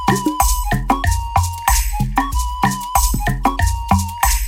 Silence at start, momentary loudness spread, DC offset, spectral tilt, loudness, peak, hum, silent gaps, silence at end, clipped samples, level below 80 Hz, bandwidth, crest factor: 0 s; 3 LU; under 0.1%; -4 dB/octave; -18 LUFS; -2 dBFS; none; none; 0 s; under 0.1%; -22 dBFS; 17 kHz; 16 dB